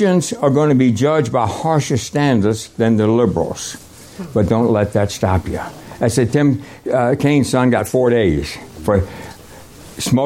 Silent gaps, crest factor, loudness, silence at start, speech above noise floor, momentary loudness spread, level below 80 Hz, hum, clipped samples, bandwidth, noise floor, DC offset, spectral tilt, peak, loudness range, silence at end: none; 14 dB; -16 LUFS; 0 s; 23 dB; 13 LU; -40 dBFS; none; under 0.1%; 16.5 kHz; -38 dBFS; under 0.1%; -6 dB/octave; -2 dBFS; 2 LU; 0 s